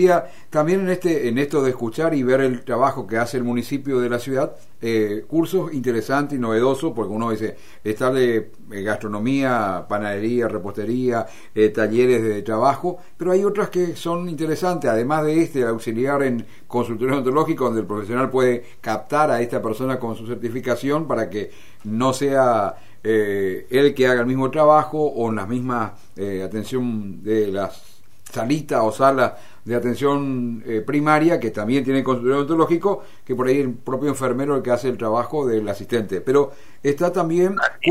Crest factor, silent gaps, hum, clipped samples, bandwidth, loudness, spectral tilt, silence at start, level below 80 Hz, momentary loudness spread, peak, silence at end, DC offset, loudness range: 18 dB; none; none; under 0.1%; 15.5 kHz; -21 LUFS; -6.5 dB/octave; 0 s; -60 dBFS; 10 LU; -2 dBFS; 0 s; 2%; 3 LU